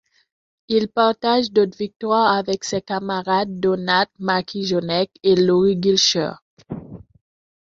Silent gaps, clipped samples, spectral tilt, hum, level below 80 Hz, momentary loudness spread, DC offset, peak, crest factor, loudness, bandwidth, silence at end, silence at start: 1.96-2.00 s, 6.42-6.57 s; under 0.1%; -4.5 dB/octave; none; -58 dBFS; 9 LU; under 0.1%; -4 dBFS; 18 dB; -19 LUFS; 7.8 kHz; 0.75 s; 0.7 s